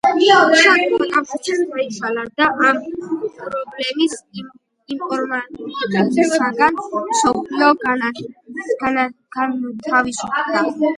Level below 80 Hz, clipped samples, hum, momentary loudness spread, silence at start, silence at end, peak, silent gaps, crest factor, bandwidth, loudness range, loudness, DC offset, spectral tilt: -58 dBFS; under 0.1%; none; 14 LU; 0.05 s; 0 s; 0 dBFS; none; 18 dB; 11.5 kHz; 5 LU; -17 LUFS; under 0.1%; -3.5 dB/octave